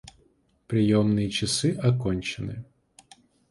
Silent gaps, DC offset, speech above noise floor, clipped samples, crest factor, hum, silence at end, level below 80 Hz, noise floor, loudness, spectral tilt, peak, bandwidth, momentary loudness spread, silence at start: none; under 0.1%; 40 dB; under 0.1%; 18 dB; none; 0.9 s; -50 dBFS; -64 dBFS; -25 LUFS; -5.5 dB/octave; -8 dBFS; 11.5 kHz; 13 LU; 0.7 s